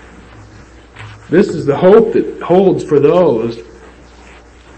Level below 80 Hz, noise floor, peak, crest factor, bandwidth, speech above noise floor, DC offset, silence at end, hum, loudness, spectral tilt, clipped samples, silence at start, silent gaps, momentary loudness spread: -44 dBFS; -39 dBFS; 0 dBFS; 14 dB; 8.6 kHz; 28 dB; under 0.1%; 1.15 s; none; -11 LUFS; -8 dB/octave; under 0.1%; 0.4 s; none; 17 LU